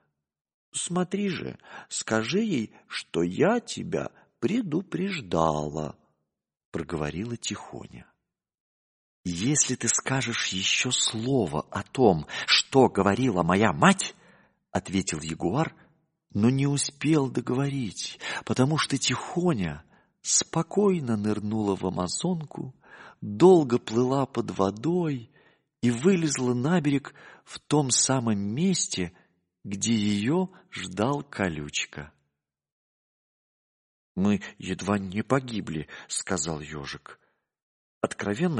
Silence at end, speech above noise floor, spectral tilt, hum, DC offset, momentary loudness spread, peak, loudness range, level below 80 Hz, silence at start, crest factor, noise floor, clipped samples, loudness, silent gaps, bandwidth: 0 s; 56 dB; -4.5 dB/octave; none; under 0.1%; 14 LU; -4 dBFS; 8 LU; -58 dBFS; 0.75 s; 24 dB; -82 dBFS; under 0.1%; -26 LUFS; 6.65-6.72 s, 8.60-9.24 s, 32.72-34.15 s, 37.62-38.01 s; 10.5 kHz